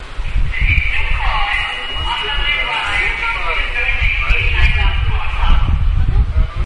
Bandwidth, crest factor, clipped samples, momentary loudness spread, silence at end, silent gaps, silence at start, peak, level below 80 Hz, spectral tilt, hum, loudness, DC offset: 10 kHz; 14 dB; under 0.1%; 5 LU; 0 s; none; 0 s; 0 dBFS; -16 dBFS; -4.5 dB/octave; none; -17 LUFS; under 0.1%